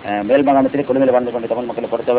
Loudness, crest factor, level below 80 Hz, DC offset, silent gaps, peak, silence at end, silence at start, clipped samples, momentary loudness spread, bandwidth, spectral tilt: -16 LUFS; 14 dB; -52 dBFS; under 0.1%; none; -2 dBFS; 0 s; 0 s; under 0.1%; 8 LU; 4 kHz; -10.5 dB/octave